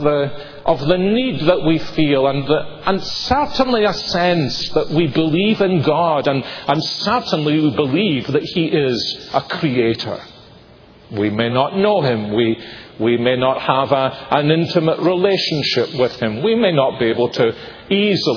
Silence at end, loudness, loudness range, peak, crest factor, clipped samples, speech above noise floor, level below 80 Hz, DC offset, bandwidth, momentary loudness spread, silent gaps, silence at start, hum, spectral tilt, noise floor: 0 s; -17 LUFS; 3 LU; 0 dBFS; 16 dB; under 0.1%; 27 dB; -44 dBFS; under 0.1%; 5.4 kHz; 5 LU; none; 0 s; none; -6.5 dB/octave; -44 dBFS